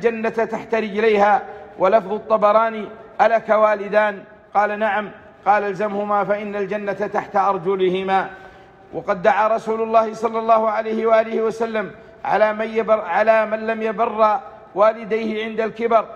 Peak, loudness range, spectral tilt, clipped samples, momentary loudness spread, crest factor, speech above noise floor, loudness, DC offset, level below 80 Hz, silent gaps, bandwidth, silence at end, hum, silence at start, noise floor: -4 dBFS; 3 LU; -6 dB/octave; under 0.1%; 9 LU; 16 dB; 25 dB; -19 LUFS; under 0.1%; -60 dBFS; none; 8 kHz; 0 s; none; 0 s; -43 dBFS